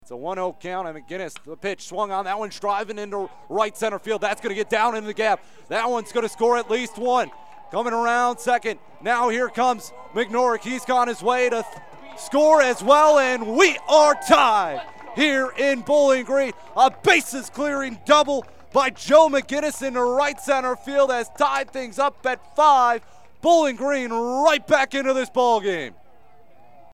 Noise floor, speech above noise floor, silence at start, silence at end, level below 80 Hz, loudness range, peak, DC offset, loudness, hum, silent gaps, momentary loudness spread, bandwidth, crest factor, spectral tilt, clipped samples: -55 dBFS; 34 dB; 0.1 s; 1.05 s; -62 dBFS; 7 LU; -4 dBFS; 0.6%; -21 LUFS; none; none; 14 LU; 15.5 kHz; 18 dB; -3 dB/octave; under 0.1%